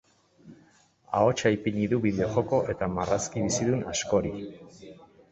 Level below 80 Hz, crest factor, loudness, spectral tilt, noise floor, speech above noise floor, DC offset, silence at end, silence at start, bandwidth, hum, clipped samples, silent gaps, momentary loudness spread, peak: -52 dBFS; 18 dB; -27 LUFS; -5 dB/octave; -61 dBFS; 34 dB; under 0.1%; 0.25 s; 0.45 s; 8.4 kHz; none; under 0.1%; none; 11 LU; -10 dBFS